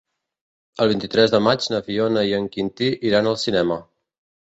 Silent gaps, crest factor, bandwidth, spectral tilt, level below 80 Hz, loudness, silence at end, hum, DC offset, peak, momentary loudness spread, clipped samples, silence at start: none; 18 dB; 8.2 kHz; -5.5 dB/octave; -56 dBFS; -20 LUFS; 0.65 s; none; under 0.1%; -2 dBFS; 7 LU; under 0.1%; 0.8 s